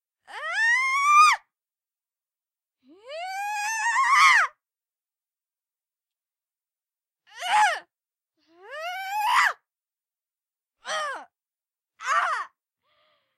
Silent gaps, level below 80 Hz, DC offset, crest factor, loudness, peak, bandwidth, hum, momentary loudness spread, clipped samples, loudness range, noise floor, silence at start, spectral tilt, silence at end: none; -80 dBFS; under 0.1%; 20 dB; -22 LUFS; -6 dBFS; 15.5 kHz; none; 22 LU; under 0.1%; 8 LU; under -90 dBFS; 0.3 s; 3 dB/octave; 0.9 s